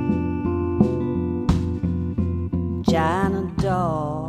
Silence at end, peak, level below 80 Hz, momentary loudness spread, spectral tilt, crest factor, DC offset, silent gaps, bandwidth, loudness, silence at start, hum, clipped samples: 0 s; -4 dBFS; -36 dBFS; 4 LU; -8 dB/octave; 18 dB; under 0.1%; none; 10.5 kHz; -23 LUFS; 0 s; none; under 0.1%